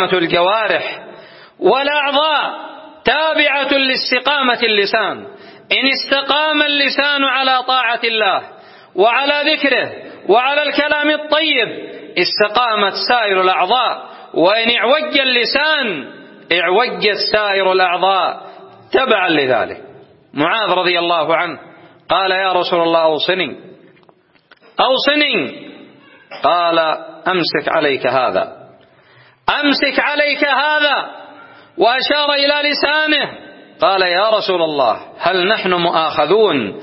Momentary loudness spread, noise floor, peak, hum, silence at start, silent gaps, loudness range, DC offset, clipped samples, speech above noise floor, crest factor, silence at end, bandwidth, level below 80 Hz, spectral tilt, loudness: 8 LU; -51 dBFS; 0 dBFS; none; 0 s; none; 3 LU; under 0.1%; under 0.1%; 37 dB; 16 dB; 0 s; 6 kHz; -58 dBFS; -7 dB/octave; -14 LUFS